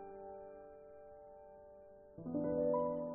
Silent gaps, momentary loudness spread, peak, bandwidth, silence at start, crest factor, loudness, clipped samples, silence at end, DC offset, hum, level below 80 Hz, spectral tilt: none; 22 LU; -26 dBFS; 2.5 kHz; 0 s; 16 dB; -39 LUFS; under 0.1%; 0 s; under 0.1%; none; -70 dBFS; -6.5 dB/octave